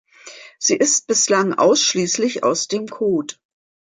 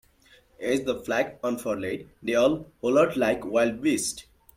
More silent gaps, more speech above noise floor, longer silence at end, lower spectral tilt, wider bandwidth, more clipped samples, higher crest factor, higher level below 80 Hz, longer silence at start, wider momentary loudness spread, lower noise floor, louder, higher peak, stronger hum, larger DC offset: neither; second, 23 dB vs 33 dB; first, 0.6 s vs 0.35 s; second, -2.5 dB/octave vs -4 dB/octave; second, 11 kHz vs 16.5 kHz; neither; about the same, 16 dB vs 18 dB; second, -68 dBFS vs -58 dBFS; second, 0.25 s vs 0.6 s; about the same, 9 LU vs 9 LU; second, -41 dBFS vs -59 dBFS; first, -17 LUFS vs -26 LUFS; first, -2 dBFS vs -10 dBFS; neither; neither